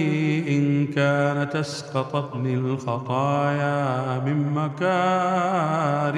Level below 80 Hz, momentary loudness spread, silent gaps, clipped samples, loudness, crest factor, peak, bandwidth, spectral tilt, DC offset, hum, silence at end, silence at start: -70 dBFS; 5 LU; none; under 0.1%; -23 LUFS; 14 dB; -8 dBFS; 10.5 kHz; -7 dB/octave; under 0.1%; none; 0 s; 0 s